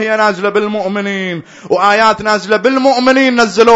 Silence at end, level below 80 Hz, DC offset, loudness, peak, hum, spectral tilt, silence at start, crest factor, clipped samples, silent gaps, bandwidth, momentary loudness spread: 0 s; -52 dBFS; under 0.1%; -12 LUFS; 0 dBFS; none; -4.5 dB/octave; 0 s; 12 dB; 0.5%; none; 8.6 kHz; 8 LU